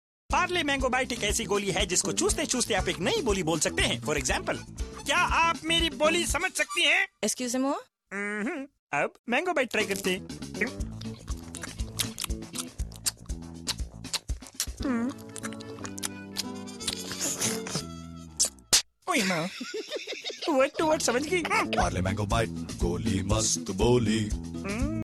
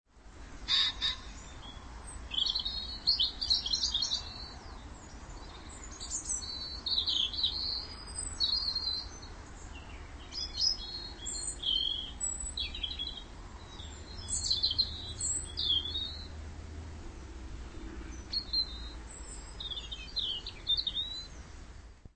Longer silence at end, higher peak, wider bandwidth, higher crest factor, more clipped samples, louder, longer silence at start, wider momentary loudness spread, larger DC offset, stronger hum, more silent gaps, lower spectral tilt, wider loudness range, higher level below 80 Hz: about the same, 0 s vs 0.05 s; first, -8 dBFS vs -14 dBFS; first, 13.5 kHz vs 8.8 kHz; about the same, 22 dB vs 22 dB; neither; first, -28 LUFS vs -32 LUFS; first, 0.3 s vs 0.15 s; second, 13 LU vs 19 LU; neither; neither; first, 8.79-8.87 s, 9.19-9.24 s vs none; first, -3 dB/octave vs -1 dB/octave; about the same, 8 LU vs 6 LU; first, -42 dBFS vs -48 dBFS